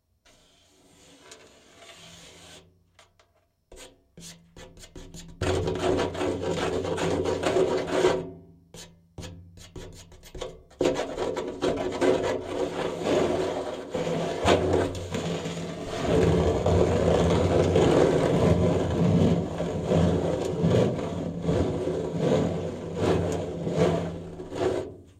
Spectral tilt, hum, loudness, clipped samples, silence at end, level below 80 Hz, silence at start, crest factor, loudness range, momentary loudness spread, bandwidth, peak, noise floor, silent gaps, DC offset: -6.5 dB/octave; none; -26 LUFS; under 0.1%; 0.2 s; -44 dBFS; 1.25 s; 20 dB; 9 LU; 22 LU; 14 kHz; -8 dBFS; -67 dBFS; none; under 0.1%